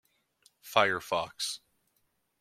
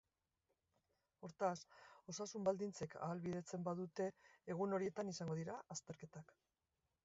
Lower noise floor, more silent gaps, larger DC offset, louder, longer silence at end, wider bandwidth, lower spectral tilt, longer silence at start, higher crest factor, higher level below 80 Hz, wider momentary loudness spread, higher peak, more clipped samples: second, -76 dBFS vs under -90 dBFS; neither; neither; first, -30 LUFS vs -46 LUFS; about the same, 0.85 s vs 0.8 s; first, 16.5 kHz vs 7.6 kHz; second, -2 dB/octave vs -6 dB/octave; second, 0.65 s vs 1.2 s; first, 26 dB vs 20 dB; first, -74 dBFS vs -82 dBFS; second, 9 LU vs 17 LU; first, -8 dBFS vs -26 dBFS; neither